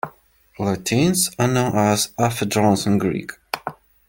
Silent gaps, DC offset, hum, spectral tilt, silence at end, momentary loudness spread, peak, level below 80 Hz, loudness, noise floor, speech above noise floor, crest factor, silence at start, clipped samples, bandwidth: none; under 0.1%; none; -4.5 dB/octave; 0.35 s; 11 LU; -4 dBFS; -50 dBFS; -20 LUFS; -51 dBFS; 32 dB; 16 dB; 0.05 s; under 0.1%; 17 kHz